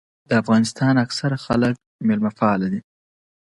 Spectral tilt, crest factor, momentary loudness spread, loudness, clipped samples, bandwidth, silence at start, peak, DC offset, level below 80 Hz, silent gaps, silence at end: -6 dB/octave; 18 dB; 6 LU; -20 LUFS; under 0.1%; 11.5 kHz; 0.3 s; -4 dBFS; under 0.1%; -52 dBFS; 1.86-1.99 s; 0.6 s